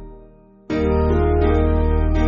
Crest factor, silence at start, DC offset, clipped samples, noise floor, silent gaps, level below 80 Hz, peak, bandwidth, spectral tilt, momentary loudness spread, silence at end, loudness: 14 dB; 0 s; under 0.1%; under 0.1%; -46 dBFS; none; -22 dBFS; -4 dBFS; 6 kHz; -8 dB/octave; 4 LU; 0 s; -19 LUFS